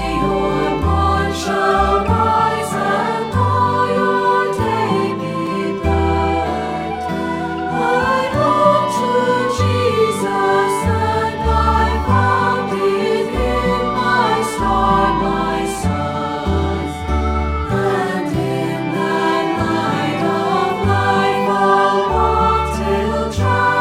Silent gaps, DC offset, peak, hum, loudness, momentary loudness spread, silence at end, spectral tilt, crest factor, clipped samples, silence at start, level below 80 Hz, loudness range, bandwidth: none; under 0.1%; -2 dBFS; none; -17 LUFS; 6 LU; 0 s; -6 dB/octave; 14 dB; under 0.1%; 0 s; -28 dBFS; 3 LU; 15.5 kHz